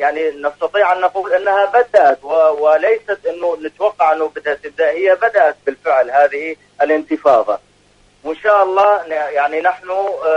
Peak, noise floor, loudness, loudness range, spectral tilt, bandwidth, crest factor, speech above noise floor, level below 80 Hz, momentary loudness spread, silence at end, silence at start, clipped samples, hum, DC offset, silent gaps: 0 dBFS; -52 dBFS; -15 LUFS; 2 LU; -4 dB/octave; 8.2 kHz; 14 dB; 37 dB; -60 dBFS; 9 LU; 0 s; 0 s; under 0.1%; 50 Hz at -60 dBFS; under 0.1%; none